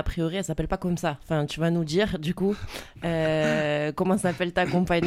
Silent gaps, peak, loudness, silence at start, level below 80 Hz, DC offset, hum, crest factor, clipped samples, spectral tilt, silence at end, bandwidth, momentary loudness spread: none; -10 dBFS; -26 LUFS; 0 s; -42 dBFS; under 0.1%; none; 16 dB; under 0.1%; -6 dB/octave; 0 s; 15 kHz; 5 LU